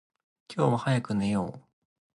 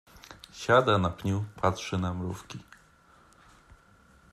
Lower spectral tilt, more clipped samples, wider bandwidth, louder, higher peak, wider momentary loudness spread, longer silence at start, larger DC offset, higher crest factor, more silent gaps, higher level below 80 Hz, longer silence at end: about the same, -7 dB/octave vs -6 dB/octave; neither; second, 11.5 kHz vs 13 kHz; about the same, -28 LUFS vs -28 LUFS; about the same, -10 dBFS vs -8 dBFS; second, 11 LU vs 23 LU; first, 0.5 s vs 0.15 s; neither; about the same, 20 dB vs 24 dB; neither; about the same, -60 dBFS vs -60 dBFS; second, 0.55 s vs 1.7 s